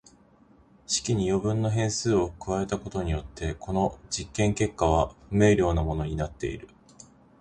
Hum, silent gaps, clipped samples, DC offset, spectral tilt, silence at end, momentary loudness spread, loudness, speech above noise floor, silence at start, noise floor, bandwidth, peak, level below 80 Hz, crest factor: none; none; under 0.1%; under 0.1%; -5.5 dB/octave; 0.75 s; 9 LU; -27 LUFS; 32 dB; 0.9 s; -58 dBFS; 10.5 kHz; -6 dBFS; -40 dBFS; 20 dB